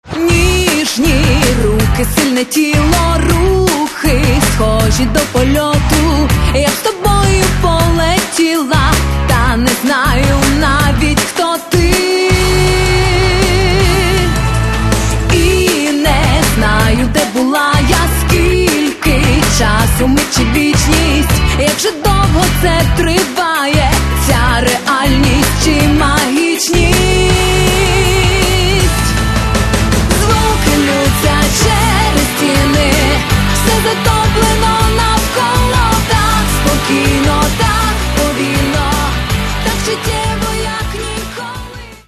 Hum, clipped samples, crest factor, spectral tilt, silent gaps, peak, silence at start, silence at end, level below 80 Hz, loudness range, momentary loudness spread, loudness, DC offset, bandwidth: none; under 0.1%; 10 dB; -4.5 dB/octave; none; 0 dBFS; 0.05 s; 0.15 s; -18 dBFS; 1 LU; 3 LU; -11 LUFS; under 0.1%; 13.5 kHz